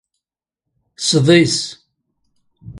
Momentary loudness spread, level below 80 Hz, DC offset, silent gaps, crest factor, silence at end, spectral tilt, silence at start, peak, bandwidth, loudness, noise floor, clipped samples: 11 LU; -54 dBFS; under 0.1%; none; 18 dB; 0 s; -4.5 dB/octave; 1 s; 0 dBFS; 11.5 kHz; -14 LUFS; -84 dBFS; under 0.1%